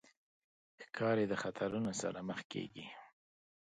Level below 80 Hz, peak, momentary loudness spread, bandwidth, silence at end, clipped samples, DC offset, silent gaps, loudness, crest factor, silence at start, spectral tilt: -74 dBFS; -22 dBFS; 17 LU; 9.4 kHz; 0.55 s; under 0.1%; under 0.1%; 2.45-2.50 s; -39 LUFS; 20 dB; 0.8 s; -5 dB/octave